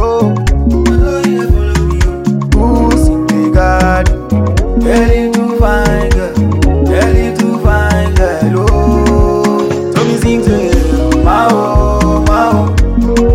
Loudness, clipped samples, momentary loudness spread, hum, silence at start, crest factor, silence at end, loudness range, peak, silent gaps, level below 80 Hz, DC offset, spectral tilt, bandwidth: -11 LUFS; 0.6%; 3 LU; none; 0 s; 10 dB; 0 s; 1 LU; 0 dBFS; none; -14 dBFS; under 0.1%; -7 dB/octave; 15.5 kHz